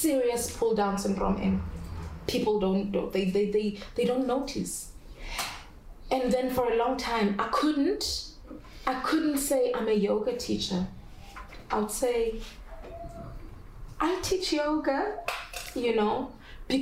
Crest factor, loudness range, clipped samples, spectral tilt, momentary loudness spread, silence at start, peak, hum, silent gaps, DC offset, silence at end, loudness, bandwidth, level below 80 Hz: 16 dB; 4 LU; under 0.1%; -4.5 dB/octave; 18 LU; 0 s; -14 dBFS; none; none; under 0.1%; 0 s; -29 LUFS; 16 kHz; -46 dBFS